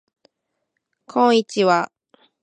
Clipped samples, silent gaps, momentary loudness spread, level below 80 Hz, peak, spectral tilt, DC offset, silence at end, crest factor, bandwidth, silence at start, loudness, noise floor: under 0.1%; none; 10 LU; -76 dBFS; -2 dBFS; -5 dB/octave; under 0.1%; 0.55 s; 20 dB; 10 kHz; 1.15 s; -18 LUFS; -77 dBFS